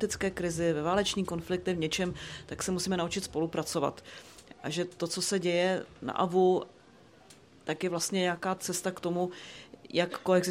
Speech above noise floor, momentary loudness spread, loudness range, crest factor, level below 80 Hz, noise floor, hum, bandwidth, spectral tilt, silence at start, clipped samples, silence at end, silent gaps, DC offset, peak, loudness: 26 dB; 14 LU; 3 LU; 18 dB; -60 dBFS; -57 dBFS; none; 16 kHz; -4 dB/octave; 0 s; under 0.1%; 0 s; none; under 0.1%; -14 dBFS; -31 LUFS